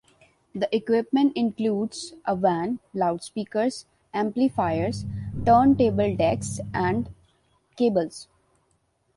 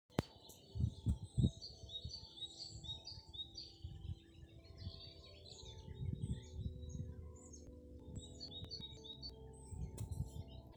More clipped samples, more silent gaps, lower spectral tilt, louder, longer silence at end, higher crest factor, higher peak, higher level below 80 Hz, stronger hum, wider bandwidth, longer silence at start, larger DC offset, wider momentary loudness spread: neither; neither; about the same, -6.5 dB/octave vs -6 dB/octave; first, -24 LUFS vs -48 LUFS; first, 0.95 s vs 0 s; second, 18 dB vs 30 dB; first, -8 dBFS vs -16 dBFS; about the same, -50 dBFS vs -54 dBFS; neither; second, 11.5 kHz vs over 20 kHz; first, 0.55 s vs 0.1 s; neither; second, 12 LU vs 15 LU